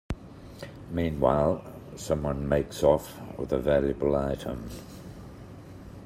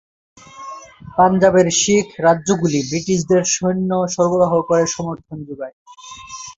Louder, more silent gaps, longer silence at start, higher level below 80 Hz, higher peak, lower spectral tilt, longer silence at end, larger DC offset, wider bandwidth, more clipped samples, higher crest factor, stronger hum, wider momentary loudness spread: second, -28 LUFS vs -16 LUFS; second, none vs 5.73-5.86 s; second, 0.1 s vs 0.55 s; first, -44 dBFS vs -52 dBFS; second, -8 dBFS vs -2 dBFS; first, -7 dB/octave vs -4.5 dB/octave; about the same, 0 s vs 0.05 s; neither; first, 16 kHz vs 8 kHz; neither; first, 22 dB vs 16 dB; neither; about the same, 21 LU vs 21 LU